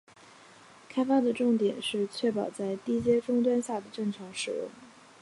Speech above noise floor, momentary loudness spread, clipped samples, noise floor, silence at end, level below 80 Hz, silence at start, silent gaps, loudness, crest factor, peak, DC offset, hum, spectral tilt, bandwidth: 26 dB; 9 LU; under 0.1%; -54 dBFS; 0.35 s; -68 dBFS; 0.9 s; none; -29 LUFS; 16 dB; -14 dBFS; under 0.1%; none; -5 dB/octave; 11.5 kHz